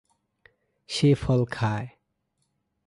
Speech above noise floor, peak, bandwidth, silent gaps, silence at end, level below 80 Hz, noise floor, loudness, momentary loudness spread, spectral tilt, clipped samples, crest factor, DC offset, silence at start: 52 dB; -10 dBFS; 11.5 kHz; none; 1 s; -52 dBFS; -76 dBFS; -25 LUFS; 12 LU; -6.5 dB/octave; under 0.1%; 18 dB; under 0.1%; 0.9 s